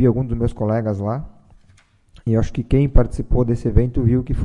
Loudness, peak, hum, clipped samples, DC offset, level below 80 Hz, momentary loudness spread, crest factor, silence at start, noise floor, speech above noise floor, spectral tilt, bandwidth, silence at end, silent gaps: -20 LUFS; -2 dBFS; none; under 0.1%; under 0.1%; -24 dBFS; 7 LU; 16 dB; 0 s; -53 dBFS; 36 dB; -9.5 dB/octave; 10 kHz; 0 s; none